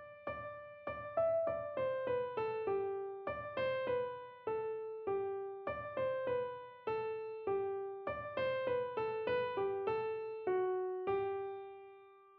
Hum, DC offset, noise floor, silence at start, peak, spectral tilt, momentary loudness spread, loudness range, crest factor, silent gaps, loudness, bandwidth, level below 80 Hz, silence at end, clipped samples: none; under 0.1%; -59 dBFS; 0 s; -24 dBFS; -4 dB/octave; 9 LU; 3 LU; 14 dB; none; -39 LUFS; 5.2 kHz; -70 dBFS; 0 s; under 0.1%